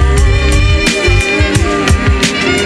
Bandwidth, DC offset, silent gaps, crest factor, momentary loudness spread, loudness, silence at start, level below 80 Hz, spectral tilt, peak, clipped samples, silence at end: 12.5 kHz; under 0.1%; none; 10 dB; 1 LU; -11 LUFS; 0 s; -14 dBFS; -4.5 dB/octave; 0 dBFS; under 0.1%; 0 s